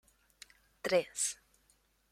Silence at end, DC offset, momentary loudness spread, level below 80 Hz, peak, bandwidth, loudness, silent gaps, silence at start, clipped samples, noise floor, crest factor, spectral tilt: 0.8 s; under 0.1%; 24 LU; -74 dBFS; -18 dBFS; 16 kHz; -34 LUFS; none; 0.85 s; under 0.1%; -72 dBFS; 22 dB; -2 dB/octave